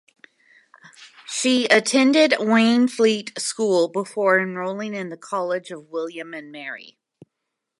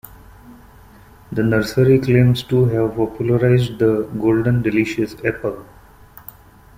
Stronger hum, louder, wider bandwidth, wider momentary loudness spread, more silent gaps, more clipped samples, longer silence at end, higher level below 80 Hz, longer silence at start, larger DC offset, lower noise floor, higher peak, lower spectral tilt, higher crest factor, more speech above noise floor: neither; second, -20 LUFS vs -17 LUFS; second, 11.5 kHz vs 16 kHz; first, 17 LU vs 13 LU; neither; neither; second, 0.95 s vs 1.15 s; second, -78 dBFS vs -44 dBFS; first, 1 s vs 0.45 s; neither; first, -81 dBFS vs -44 dBFS; about the same, 0 dBFS vs -2 dBFS; second, -3.5 dB/octave vs -8 dB/octave; first, 22 dB vs 16 dB; first, 60 dB vs 28 dB